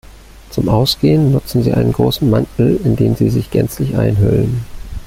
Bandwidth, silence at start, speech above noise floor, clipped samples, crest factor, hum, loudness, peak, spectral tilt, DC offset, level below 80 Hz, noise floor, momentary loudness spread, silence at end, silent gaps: 16 kHz; 0.35 s; 24 dB; under 0.1%; 12 dB; none; -14 LUFS; 0 dBFS; -7.5 dB/octave; under 0.1%; -32 dBFS; -37 dBFS; 6 LU; 0 s; none